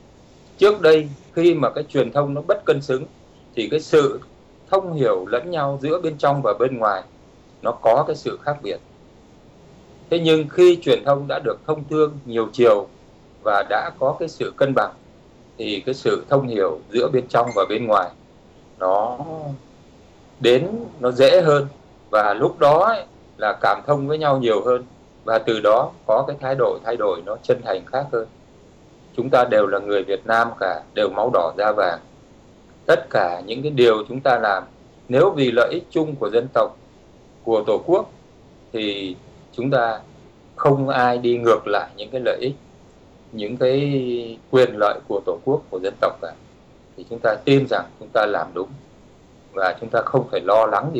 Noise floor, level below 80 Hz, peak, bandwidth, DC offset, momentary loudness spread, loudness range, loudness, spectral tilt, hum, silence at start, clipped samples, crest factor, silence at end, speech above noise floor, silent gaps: -49 dBFS; -56 dBFS; -6 dBFS; 9.4 kHz; under 0.1%; 12 LU; 4 LU; -20 LUFS; -6.5 dB/octave; none; 0.6 s; under 0.1%; 14 dB; 0 s; 30 dB; none